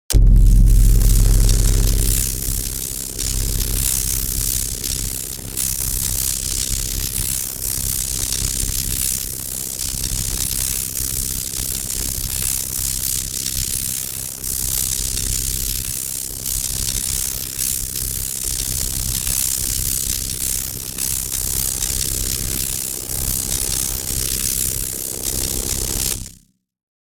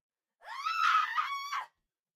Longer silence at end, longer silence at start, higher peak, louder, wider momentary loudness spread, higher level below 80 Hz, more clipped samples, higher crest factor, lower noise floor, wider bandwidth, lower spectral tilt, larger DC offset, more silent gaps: first, 0.7 s vs 0.5 s; second, 0.1 s vs 0.45 s; first, -4 dBFS vs -16 dBFS; first, -19 LUFS vs -31 LUFS; second, 5 LU vs 16 LU; first, -22 dBFS vs -86 dBFS; neither; about the same, 16 dB vs 18 dB; second, -51 dBFS vs -68 dBFS; first, over 20 kHz vs 15.5 kHz; first, -2.5 dB/octave vs 3.5 dB/octave; neither; neither